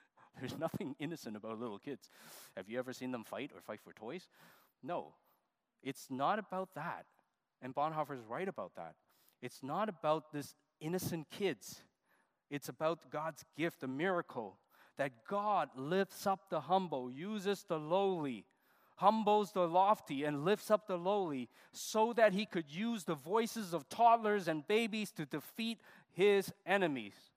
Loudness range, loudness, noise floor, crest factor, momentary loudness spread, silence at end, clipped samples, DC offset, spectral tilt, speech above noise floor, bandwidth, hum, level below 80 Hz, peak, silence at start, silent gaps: 11 LU; -37 LUFS; -82 dBFS; 22 dB; 18 LU; 0.25 s; under 0.1%; under 0.1%; -5 dB/octave; 45 dB; 15.5 kHz; none; -86 dBFS; -16 dBFS; 0.35 s; none